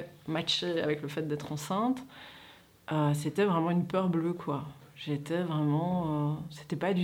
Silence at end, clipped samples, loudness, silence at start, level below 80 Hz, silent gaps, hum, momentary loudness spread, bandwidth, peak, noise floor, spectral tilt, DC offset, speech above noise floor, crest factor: 0 s; under 0.1%; -31 LUFS; 0 s; -66 dBFS; none; none; 12 LU; 16.5 kHz; -16 dBFS; -56 dBFS; -6.5 dB/octave; under 0.1%; 25 dB; 16 dB